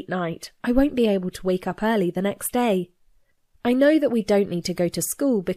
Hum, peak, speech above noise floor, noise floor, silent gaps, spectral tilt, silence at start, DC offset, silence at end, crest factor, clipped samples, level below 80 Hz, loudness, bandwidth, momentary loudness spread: none; -6 dBFS; 39 dB; -60 dBFS; none; -5.5 dB/octave; 0 s; under 0.1%; 0 s; 16 dB; under 0.1%; -44 dBFS; -23 LUFS; 15.5 kHz; 9 LU